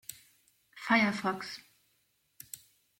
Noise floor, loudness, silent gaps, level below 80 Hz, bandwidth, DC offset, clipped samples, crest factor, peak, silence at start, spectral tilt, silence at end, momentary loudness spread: -75 dBFS; -30 LUFS; none; -74 dBFS; 16.5 kHz; under 0.1%; under 0.1%; 22 dB; -14 dBFS; 0.1 s; -4 dB/octave; 0.45 s; 21 LU